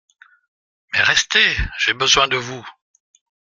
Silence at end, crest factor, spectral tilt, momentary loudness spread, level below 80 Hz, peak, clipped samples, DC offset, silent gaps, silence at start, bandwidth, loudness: 0.85 s; 20 dB; -1 dB/octave; 10 LU; -38 dBFS; 0 dBFS; under 0.1%; under 0.1%; none; 0.95 s; 14 kHz; -16 LUFS